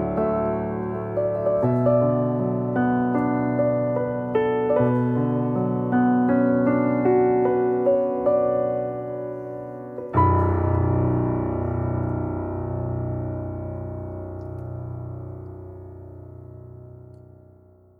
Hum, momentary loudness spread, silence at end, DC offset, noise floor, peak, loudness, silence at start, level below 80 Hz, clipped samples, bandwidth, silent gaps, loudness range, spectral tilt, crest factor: none; 16 LU; 0.85 s; under 0.1%; -52 dBFS; -8 dBFS; -23 LUFS; 0 s; -46 dBFS; under 0.1%; 3.3 kHz; none; 14 LU; -11.5 dB/octave; 16 dB